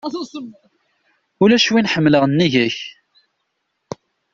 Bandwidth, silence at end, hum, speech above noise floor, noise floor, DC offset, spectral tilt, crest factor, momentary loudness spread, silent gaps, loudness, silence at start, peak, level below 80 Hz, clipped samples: 7.6 kHz; 1.45 s; none; 56 dB; -72 dBFS; under 0.1%; -5 dB/octave; 16 dB; 22 LU; none; -16 LUFS; 0.05 s; -2 dBFS; -56 dBFS; under 0.1%